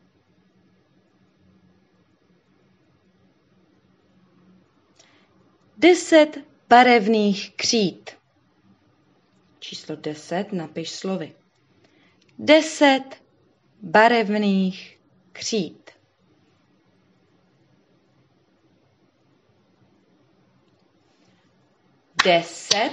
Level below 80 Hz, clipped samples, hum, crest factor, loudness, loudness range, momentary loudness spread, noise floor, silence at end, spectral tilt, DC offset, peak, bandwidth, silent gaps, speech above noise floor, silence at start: -74 dBFS; under 0.1%; none; 22 dB; -19 LUFS; 14 LU; 21 LU; -62 dBFS; 0 s; -4 dB/octave; under 0.1%; -2 dBFS; 10 kHz; none; 43 dB; 5.8 s